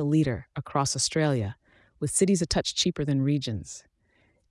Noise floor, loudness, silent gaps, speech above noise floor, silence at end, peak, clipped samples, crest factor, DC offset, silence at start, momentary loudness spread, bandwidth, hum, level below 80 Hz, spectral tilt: -67 dBFS; -26 LUFS; none; 41 dB; 0.7 s; -10 dBFS; under 0.1%; 16 dB; under 0.1%; 0 s; 12 LU; 12 kHz; none; -52 dBFS; -4.5 dB/octave